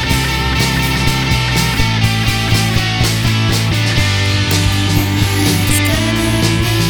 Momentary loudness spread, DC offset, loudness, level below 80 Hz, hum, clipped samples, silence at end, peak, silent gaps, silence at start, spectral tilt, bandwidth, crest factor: 1 LU; 0.3%; -13 LUFS; -24 dBFS; none; under 0.1%; 0 s; 0 dBFS; none; 0 s; -4 dB/octave; over 20 kHz; 12 dB